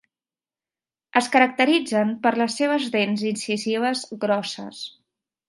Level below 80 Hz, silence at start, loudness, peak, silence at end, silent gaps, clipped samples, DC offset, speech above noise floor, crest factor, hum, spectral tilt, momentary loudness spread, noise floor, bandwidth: -74 dBFS; 1.15 s; -22 LUFS; -2 dBFS; 0.6 s; none; under 0.1%; under 0.1%; over 68 dB; 20 dB; none; -4 dB/octave; 14 LU; under -90 dBFS; 11.5 kHz